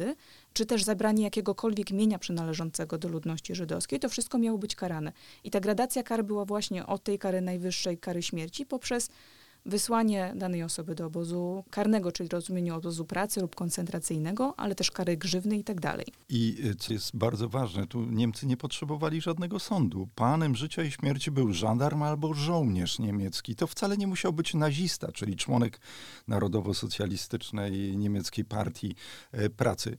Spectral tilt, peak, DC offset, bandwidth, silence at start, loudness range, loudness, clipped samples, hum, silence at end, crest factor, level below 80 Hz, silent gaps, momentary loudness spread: -5 dB/octave; -10 dBFS; 0.2%; 18.5 kHz; 0 s; 3 LU; -31 LUFS; under 0.1%; none; 0 s; 20 dB; -60 dBFS; none; 7 LU